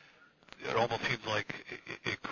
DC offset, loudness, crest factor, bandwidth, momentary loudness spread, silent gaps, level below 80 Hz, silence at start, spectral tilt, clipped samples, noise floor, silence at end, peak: under 0.1%; -35 LUFS; 20 dB; 7.2 kHz; 12 LU; none; -68 dBFS; 0.2 s; -4 dB/octave; under 0.1%; -61 dBFS; 0 s; -18 dBFS